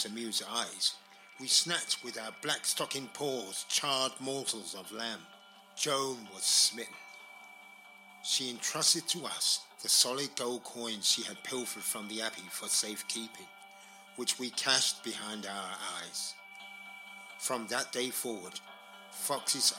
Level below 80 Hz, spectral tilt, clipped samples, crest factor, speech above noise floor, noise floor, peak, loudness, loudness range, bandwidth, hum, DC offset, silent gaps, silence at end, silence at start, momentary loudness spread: -90 dBFS; -0.5 dB/octave; under 0.1%; 24 dB; 21 dB; -55 dBFS; -10 dBFS; -32 LUFS; 6 LU; 16.5 kHz; none; under 0.1%; none; 0 s; 0 s; 20 LU